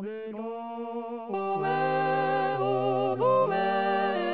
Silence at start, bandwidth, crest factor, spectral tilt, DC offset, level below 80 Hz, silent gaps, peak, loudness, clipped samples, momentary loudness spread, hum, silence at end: 0 s; 5 kHz; 14 dB; -4 dB/octave; 0.2%; -80 dBFS; none; -14 dBFS; -28 LUFS; under 0.1%; 12 LU; none; 0 s